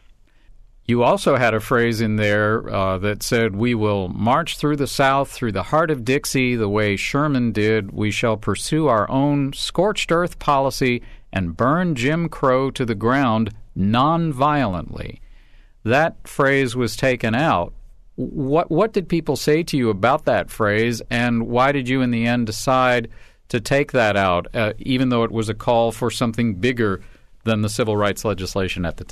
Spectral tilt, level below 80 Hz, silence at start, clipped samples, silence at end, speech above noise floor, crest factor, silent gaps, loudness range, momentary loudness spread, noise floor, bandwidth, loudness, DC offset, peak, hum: -5.5 dB/octave; -40 dBFS; 0.5 s; under 0.1%; 0.05 s; 30 dB; 14 dB; none; 2 LU; 6 LU; -49 dBFS; 13.5 kHz; -20 LUFS; under 0.1%; -6 dBFS; none